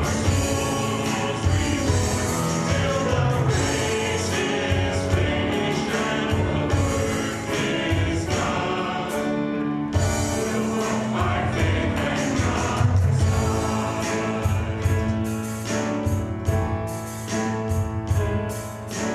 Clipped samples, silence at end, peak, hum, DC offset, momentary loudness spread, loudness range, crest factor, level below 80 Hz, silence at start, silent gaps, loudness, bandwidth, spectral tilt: under 0.1%; 0 s; -8 dBFS; none; under 0.1%; 4 LU; 3 LU; 16 dB; -36 dBFS; 0 s; none; -23 LUFS; 14 kHz; -5 dB/octave